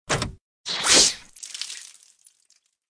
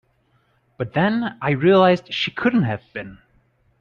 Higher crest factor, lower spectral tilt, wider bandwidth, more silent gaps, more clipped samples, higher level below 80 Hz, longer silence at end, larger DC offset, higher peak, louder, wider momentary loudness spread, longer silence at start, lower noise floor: first, 24 dB vs 18 dB; second, -0.5 dB/octave vs -7.5 dB/octave; first, 11 kHz vs 7.2 kHz; first, 0.41-0.64 s vs none; neither; first, -50 dBFS vs -58 dBFS; first, 1.05 s vs 0.65 s; neither; about the same, -2 dBFS vs -4 dBFS; about the same, -19 LUFS vs -19 LUFS; first, 22 LU vs 18 LU; second, 0.1 s vs 0.8 s; about the same, -65 dBFS vs -63 dBFS